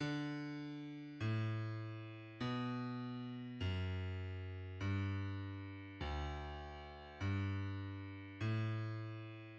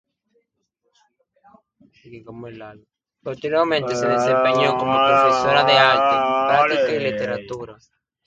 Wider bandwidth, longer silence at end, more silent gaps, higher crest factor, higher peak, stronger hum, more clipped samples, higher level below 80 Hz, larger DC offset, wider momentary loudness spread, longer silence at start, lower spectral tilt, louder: second, 7 kHz vs 9.2 kHz; second, 0 s vs 0.55 s; neither; second, 14 dB vs 20 dB; second, -30 dBFS vs 0 dBFS; neither; neither; about the same, -58 dBFS vs -58 dBFS; neither; second, 10 LU vs 23 LU; second, 0 s vs 2.1 s; first, -7.5 dB/octave vs -4.5 dB/octave; second, -44 LUFS vs -17 LUFS